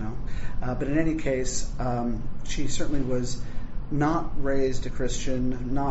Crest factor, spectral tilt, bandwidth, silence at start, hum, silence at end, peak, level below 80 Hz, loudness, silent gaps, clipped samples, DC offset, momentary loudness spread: 14 dB; -6 dB/octave; 8 kHz; 0 s; none; 0 s; -10 dBFS; -32 dBFS; -29 LUFS; none; under 0.1%; under 0.1%; 10 LU